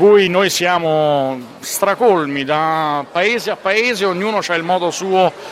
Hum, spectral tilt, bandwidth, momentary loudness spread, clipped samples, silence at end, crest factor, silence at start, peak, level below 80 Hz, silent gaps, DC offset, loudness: none; -4 dB/octave; 16 kHz; 5 LU; under 0.1%; 0 s; 14 dB; 0 s; 0 dBFS; -62 dBFS; none; under 0.1%; -16 LUFS